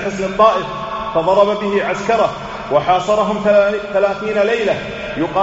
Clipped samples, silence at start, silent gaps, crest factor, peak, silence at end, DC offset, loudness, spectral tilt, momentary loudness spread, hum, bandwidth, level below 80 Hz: under 0.1%; 0 s; none; 16 dB; 0 dBFS; 0 s; under 0.1%; -16 LUFS; -3.5 dB/octave; 8 LU; none; 8 kHz; -44 dBFS